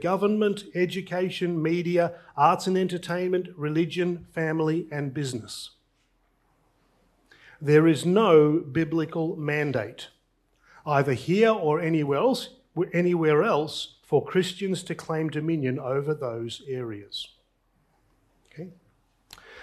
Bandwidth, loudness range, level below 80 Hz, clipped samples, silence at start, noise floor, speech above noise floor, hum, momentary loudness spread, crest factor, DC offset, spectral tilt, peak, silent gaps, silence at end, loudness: 13.5 kHz; 9 LU; -66 dBFS; under 0.1%; 0 s; -68 dBFS; 44 dB; none; 14 LU; 20 dB; under 0.1%; -6.5 dB/octave; -6 dBFS; none; 0 s; -25 LUFS